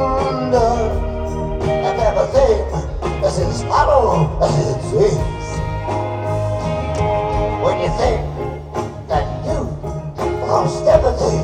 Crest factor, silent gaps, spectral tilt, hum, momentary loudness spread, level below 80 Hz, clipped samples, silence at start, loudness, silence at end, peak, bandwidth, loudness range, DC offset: 18 dB; none; -6.5 dB/octave; none; 9 LU; -26 dBFS; under 0.1%; 0 s; -18 LUFS; 0 s; 0 dBFS; 10.5 kHz; 4 LU; under 0.1%